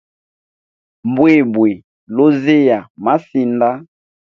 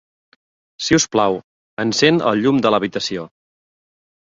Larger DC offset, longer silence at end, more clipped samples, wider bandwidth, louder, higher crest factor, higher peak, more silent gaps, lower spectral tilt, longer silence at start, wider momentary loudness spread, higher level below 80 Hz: neither; second, 0.5 s vs 0.95 s; neither; second, 6.4 kHz vs 7.8 kHz; first, -14 LUFS vs -17 LUFS; about the same, 14 dB vs 18 dB; about the same, 0 dBFS vs -2 dBFS; about the same, 1.84-2.07 s, 2.90-2.95 s vs 1.44-1.77 s; first, -8.5 dB/octave vs -4 dB/octave; first, 1.05 s vs 0.8 s; about the same, 12 LU vs 13 LU; second, -60 dBFS vs -52 dBFS